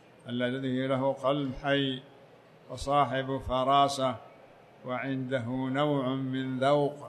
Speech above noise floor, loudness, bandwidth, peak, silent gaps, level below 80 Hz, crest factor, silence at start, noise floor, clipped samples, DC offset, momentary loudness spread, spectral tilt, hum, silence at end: 26 dB; -29 LUFS; 12.5 kHz; -12 dBFS; none; -54 dBFS; 18 dB; 0.25 s; -55 dBFS; under 0.1%; under 0.1%; 12 LU; -6 dB/octave; none; 0 s